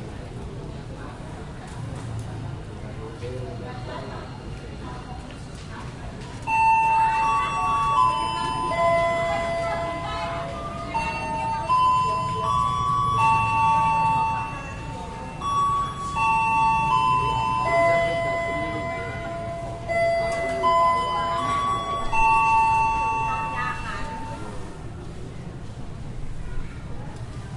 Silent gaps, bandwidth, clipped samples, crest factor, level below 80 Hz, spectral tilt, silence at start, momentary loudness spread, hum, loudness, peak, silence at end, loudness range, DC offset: none; 11.5 kHz; under 0.1%; 16 dB; -40 dBFS; -5 dB/octave; 0 s; 17 LU; none; -23 LUFS; -8 dBFS; 0 s; 14 LU; under 0.1%